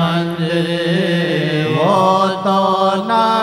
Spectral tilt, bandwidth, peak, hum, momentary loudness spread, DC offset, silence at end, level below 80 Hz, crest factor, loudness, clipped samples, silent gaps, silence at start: -6.5 dB/octave; 14.5 kHz; -2 dBFS; none; 4 LU; under 0.1%; 0 s; -56 dBFS; 14 dB; -15 LUFS; under 0.1%; none; 0 s